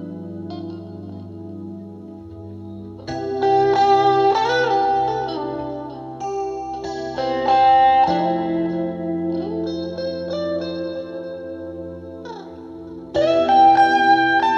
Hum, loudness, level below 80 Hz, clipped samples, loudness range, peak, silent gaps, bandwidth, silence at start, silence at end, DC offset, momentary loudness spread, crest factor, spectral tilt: none; -19 LUFS; -52 dBFS; under 0.1%; 9 LU; -4 dBFS; none; 7.2 kHz; 0 s; 0 s; under 0.1%; 21 LU; 16 dB; -6 dB/octave